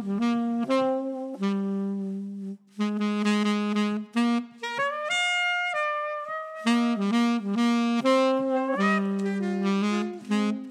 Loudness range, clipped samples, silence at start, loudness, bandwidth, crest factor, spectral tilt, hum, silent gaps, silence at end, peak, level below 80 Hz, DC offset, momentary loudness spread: 3 LU; under 0.1%; 0 s; -26 LUFS; 11 kHz; 16 dB; -5.5 dB/octave; none; none; 0 s; -10 dBFS; -84 dBFS; under 0.1%; 8 LU